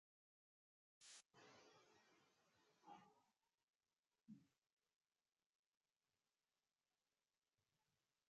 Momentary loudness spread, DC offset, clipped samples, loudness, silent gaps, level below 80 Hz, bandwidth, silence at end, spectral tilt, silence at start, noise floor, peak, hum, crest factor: 4 LU; under 0.1%; under 0.1%; -68 LUFS; 3.64-3.68 s, 3.76-3.80 s, 3.99-4.03 s, 4.72-4.77 s, 5.46-5.81 s; under -90 dBFS; 7.2 kHz; 0.1 s; -2.5 dB/octave; 1 s; under -90 dBFS; -52 dBFS; none; 24 dB